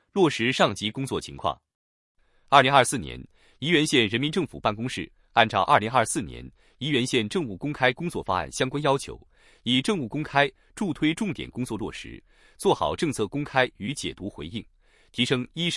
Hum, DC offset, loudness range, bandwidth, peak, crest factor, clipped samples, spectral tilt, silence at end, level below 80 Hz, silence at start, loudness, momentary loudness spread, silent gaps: none; under 0.1%; 5 LU; 12 kHz; -2 dBFS; 24 dB; under 0.1%; -4.5 dB/octave; 0 s; -54 dBFS; 0.15 s; -25 LUFS; 15 LU; 1.75-2.15 s